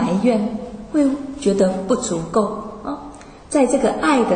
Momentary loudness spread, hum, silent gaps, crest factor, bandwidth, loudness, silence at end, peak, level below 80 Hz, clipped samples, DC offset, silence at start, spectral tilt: 13 LU; none; none; 14 dB; 9.6 kHz; -20 LUFS; 0 s; -4 dBFS; -46 dBFS; under 0.1%; under 0.1%; 0 s; -5.5 dB/octave